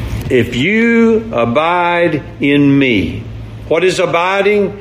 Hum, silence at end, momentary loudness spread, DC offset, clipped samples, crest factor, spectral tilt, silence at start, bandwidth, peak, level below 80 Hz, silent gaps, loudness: none; 0 s; 7 LU; under 0.1%; under 0.1%; 12 dB; -6 dB/octave; 0 s; 15.5 kHz; 0 dBFS; -34 dBFS; none; -12 LUFS